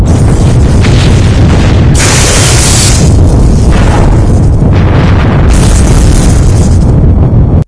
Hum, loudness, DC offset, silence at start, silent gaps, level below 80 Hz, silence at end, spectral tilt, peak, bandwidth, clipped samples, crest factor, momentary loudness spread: none; -5 LUFS; 0.8%; 0 s; none; -8 dBFS; 0.05 s; -5.5 dB/octave; 0 dBFS; 11 kHz; 10%; 4 dB; 2 LU